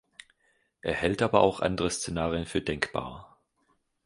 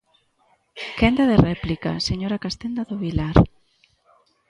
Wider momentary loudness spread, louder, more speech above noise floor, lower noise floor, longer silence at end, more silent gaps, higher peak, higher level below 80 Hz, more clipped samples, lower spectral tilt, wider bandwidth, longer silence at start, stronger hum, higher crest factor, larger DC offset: about the same, 13 LU vs 11 LU; second, -28 LUFS vs -21 LUFS; about the same, 44 dB vs 44 dB; first, -72 dBFS vs -64 dBFS; second, 0.8 s vs 1 s; neither; second, -4 dBFS vs 0 dBFS; second, -50 dBFS vs -36 dBFS; neither; second, -4.5 dB/octave vs -7 dB/octave; about the same, 11.5 kHz vs 11 kHz; about the same, 0.85 s vs 0.75 s; neither; about the same, 26 dB vs 22 dB; neither